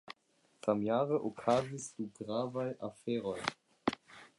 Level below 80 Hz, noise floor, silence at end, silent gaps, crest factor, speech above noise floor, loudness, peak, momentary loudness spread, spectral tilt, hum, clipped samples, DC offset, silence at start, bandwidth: -72 dBFS; -72 dBFS; 0.1 s; none; 24 dB; 37 dB; -36 LUFS; -12 dBFS; 11 LU; -5.5 dB/octave; none; under 0.1%; under 0.1%; 0.1 s; 11.5 kHz